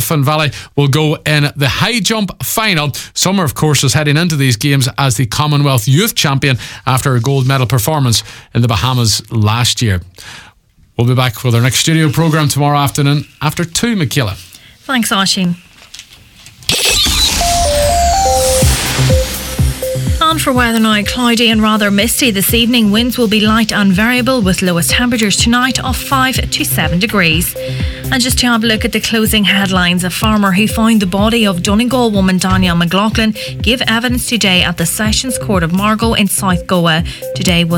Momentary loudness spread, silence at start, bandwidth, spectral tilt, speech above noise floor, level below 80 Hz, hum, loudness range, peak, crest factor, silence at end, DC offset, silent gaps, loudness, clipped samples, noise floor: 6 LU; 0 s; 19 kHz; -4 dB/octave; 34 dB; -26 dBFS; none; 3 LU; 0 dBFS; 12 dB; 0 s; under 0.1%; none; -12 LUFS; under 0.1%; -46 dBFS